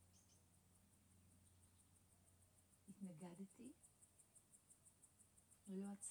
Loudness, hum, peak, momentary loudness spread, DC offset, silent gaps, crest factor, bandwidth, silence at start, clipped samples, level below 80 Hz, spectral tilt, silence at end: -58 LUFS; none; -42 dBFS; 16 LU; under 0.1%; none; 20 dB; over 20 kHz; 0 s; under 0.1%; -88 dBFS; -5.5 dB/octave; 0 s